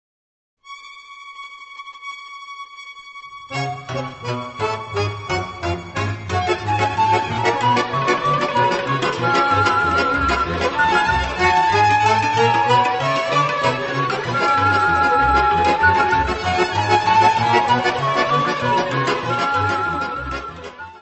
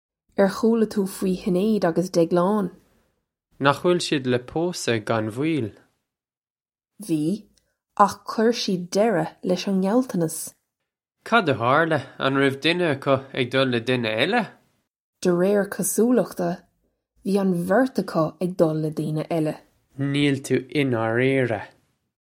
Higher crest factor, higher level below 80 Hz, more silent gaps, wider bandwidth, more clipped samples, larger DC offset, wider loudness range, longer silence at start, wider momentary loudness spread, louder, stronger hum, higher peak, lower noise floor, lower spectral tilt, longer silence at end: about the same, 18 dB vs 22 dB; first, -40 dBFS vs -62 dBFS; second, none vs 6.37-6.42 s, 6.50-6.55 s, 15.00-15.13 s; second, 8.4 kHz vs 16.5 kHz; neither; neither; first, 12 LU vs 4 LU; first, 0.65 s vs 0.4 s; first, 19 LU vs 8 LU; first, -18 LUFS vs -23 LUFS; neither; about the same, 0 dBFS vs 0 dBFS; second, -39 dBFS vs under -90 dBFS; about the same, -5 dB/octave vs -5.5 dB/octave; second, 0.05 s vs 0.55 s